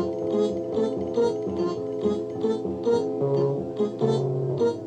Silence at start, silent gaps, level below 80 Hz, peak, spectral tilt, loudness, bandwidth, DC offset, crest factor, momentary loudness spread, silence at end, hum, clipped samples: 0 s; none; -60 dBFS; -12 dBFS; -8 dB/octave; -26 LUFS; 9 kHz; under 0.1%; 14 dB; 3 LU; 0 s; none; under 0.1%